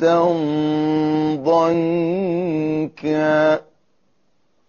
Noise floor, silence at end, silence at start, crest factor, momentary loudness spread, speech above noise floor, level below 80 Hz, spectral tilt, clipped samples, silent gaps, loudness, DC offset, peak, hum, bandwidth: -67 dBFS; 1.05 s; 0 s; 14 dB; 5 LU; 49 dB; -58 dBFS; -6 dB/octave; under 0.1%; none; -19 LUFS; under 0.1%; -6 dBFS; none; 7 kHz